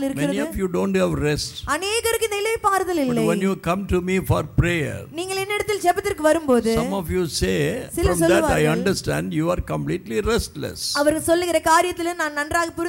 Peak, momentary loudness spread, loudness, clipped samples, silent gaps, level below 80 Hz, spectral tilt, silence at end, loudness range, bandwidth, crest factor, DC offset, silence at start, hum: -6 dBFS; 7 LU; -21 LUFS; under 0.1%; none; -38 dBFS; -5 dB/octave; 0 s; 2 LU; 17 kHz; 16 dB; under 0.1%; 0 s; none